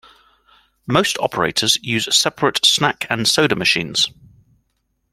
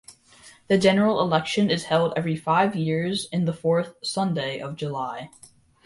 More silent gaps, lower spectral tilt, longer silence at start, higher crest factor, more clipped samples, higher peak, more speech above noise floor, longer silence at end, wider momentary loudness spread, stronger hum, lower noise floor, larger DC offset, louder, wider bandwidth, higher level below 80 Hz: neither; second, -2.5 dB/octave vs -5.5 dB/octave; first, 0.9 s vs 0.1 s; about the same, 18 dB vs 18 dB; neither; first, 0 dBFS vs -6 dBFS; first, 51 dB vs 29 dB; first, 1.05 s vs 0.6 s; second, 6 LU vs 11 LU; neither; first, -69 dBFS vs -52 dBFS; neither; first, -16 LUFS vs -24 LUFS; first, 16.5 kHz vs 11.5 kHz; first, -54 dBFS vs -62 dBFS